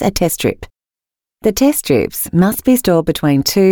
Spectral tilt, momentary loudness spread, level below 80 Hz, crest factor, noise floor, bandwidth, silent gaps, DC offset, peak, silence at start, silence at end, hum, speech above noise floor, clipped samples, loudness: -5 dB/octave; 6 LU; -38 dBFS; 14 dB; -89 dBFS; over 20 kHz; none; under 0.1%; -2 dBFS; 0 s; 0 s; none; 76 dB; under 0.1%; -14 LUFS